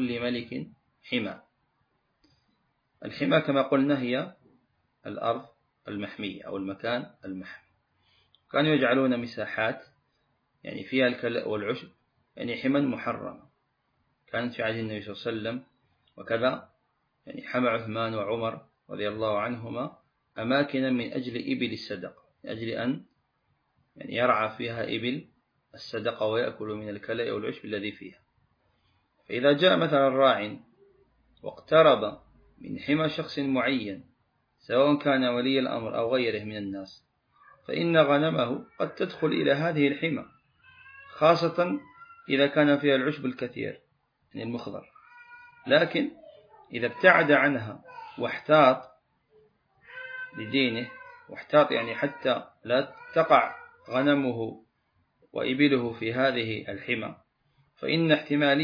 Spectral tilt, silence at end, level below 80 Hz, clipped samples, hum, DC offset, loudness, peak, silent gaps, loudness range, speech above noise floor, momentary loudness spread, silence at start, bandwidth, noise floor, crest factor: -7.5 dB/octave; 0 s; -70 dBFS; under 0.1%; none; under 0.1%; -27 LUFS; -4 dBFS; none; 8 LU; 47 dB; 19 LU; 0 s; 5.2 kHz; -74 dBFS; 24 dB